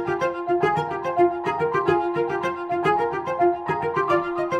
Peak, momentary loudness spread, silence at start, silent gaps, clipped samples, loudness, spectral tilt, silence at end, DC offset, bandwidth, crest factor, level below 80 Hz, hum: -6 dBFS; 4 LU; 0 s; none; under 0.1%; -23 LUFS; -7 dB/octave; 0 s; under 0.1%; 8.8 kHz; 16 dB; -58 dBFS; none